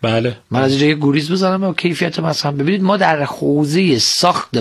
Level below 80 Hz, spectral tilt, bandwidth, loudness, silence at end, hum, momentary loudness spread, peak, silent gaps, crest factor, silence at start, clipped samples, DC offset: -56 dBFS; -5 dB/octave; 13 kHz; -15 LUFS; 0 s; none; 5 LU; 0 dBFS; none; 16 dB; 0 s; under 0.1%; under 0.1%